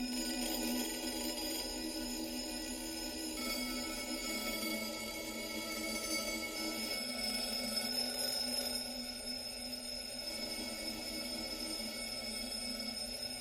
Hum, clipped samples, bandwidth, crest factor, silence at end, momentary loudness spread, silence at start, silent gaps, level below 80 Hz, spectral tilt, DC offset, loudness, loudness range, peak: none; under 0.1%; 16.5 kHz; 16 dB; 0 s; 5 LU; 0 s; none; -58 dBFS; -1.5 dB/octave; under 0.1%; -38 LUFS; 3 LU; -24 dBFS